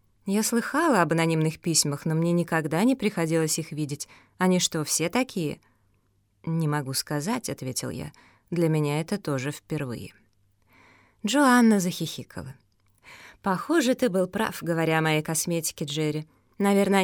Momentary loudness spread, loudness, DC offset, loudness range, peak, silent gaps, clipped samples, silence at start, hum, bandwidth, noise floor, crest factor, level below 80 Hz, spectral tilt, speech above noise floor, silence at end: 13 LU; -25 LUFS; under 0.1%; 6 LU; -6 dBFS; none; under 0.1%; 0.25 s; none; 19 kHz; -67 dBFS; 20 dB; -64 dBFS; -4.5 dB/octave; 42 dB; 0 s